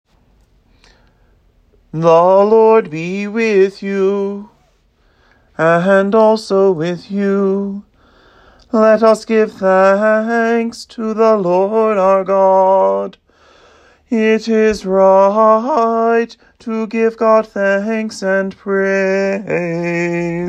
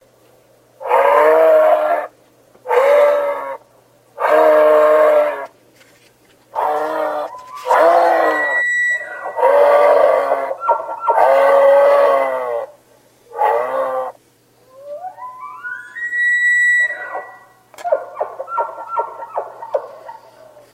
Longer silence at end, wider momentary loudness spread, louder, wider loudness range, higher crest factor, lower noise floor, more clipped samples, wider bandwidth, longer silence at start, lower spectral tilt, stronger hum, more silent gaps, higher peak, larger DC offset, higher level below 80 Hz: second, 0 s vs 0.55 s; second, 11 LU vs 19 LU; about the same, -13 LUFS vs -14 LUFS; second, 3 LU vs 9 LU; about the same, 14 dB vs 16 dB; about the same, -55 dBFS vs -53 dBFS; neither; second, 10 kHz vs 15.5 kHz; first, 1.95 s vs 0.8 s; first, -6.5 dB/octave vs -2.5 dB/octave; neither; neither; about the same, 0 dBFS vs 0 dBFS; neither; first, -52 dBFS vs -70 dBFS